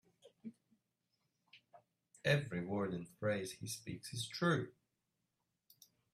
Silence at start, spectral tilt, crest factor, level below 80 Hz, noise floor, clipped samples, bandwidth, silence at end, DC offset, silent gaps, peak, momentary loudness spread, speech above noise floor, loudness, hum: 0.25 s; -5 dB/octave; 22 dB; -76 dBFS; -87 dBFS; under 0.1%; 15 kHz; 1.45 s; under 0.1%; none; -20 dBFS; 19 LU; 48 dB; -40 LUFS; none